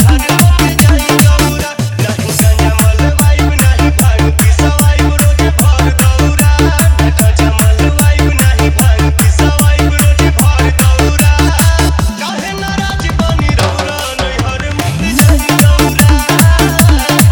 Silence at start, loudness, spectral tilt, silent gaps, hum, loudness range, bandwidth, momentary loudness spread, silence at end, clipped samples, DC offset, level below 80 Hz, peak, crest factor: 0 s; -9 LUFS; -5 dB/octave; none; none; 3 LU; over 20 kHz; 7 LU; 0 s; 0.6%; under 0.1%; -12 dBFS; 0 dBFS; 8 dB